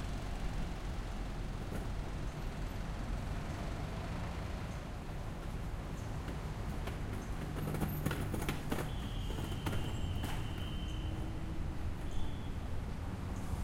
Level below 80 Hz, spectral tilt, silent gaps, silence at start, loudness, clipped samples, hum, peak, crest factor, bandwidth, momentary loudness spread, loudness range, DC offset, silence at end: -42 dBFS; -6 dB/octave; none; 0 s; -41 LUFS; under 0.1%; none; -20 dBFS; 18 dB; 16 kHz; 5 LU; 3 LU; under 0.1%; 0 s